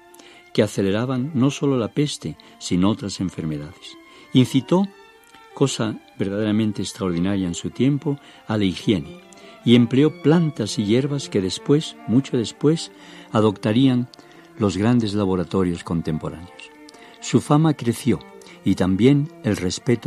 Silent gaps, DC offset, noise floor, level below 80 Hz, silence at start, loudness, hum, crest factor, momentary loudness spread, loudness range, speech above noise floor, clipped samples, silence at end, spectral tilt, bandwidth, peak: none; under 0.1%; -48 dBFS; -54 dBFS; 0.55 s; -21 LUFS; none; 18 dB; 11 LU; 4 LU; 27 dB; under 0.1%; 0 s; -6.5 dB/octave; 13.5 kHz; -2 dBFS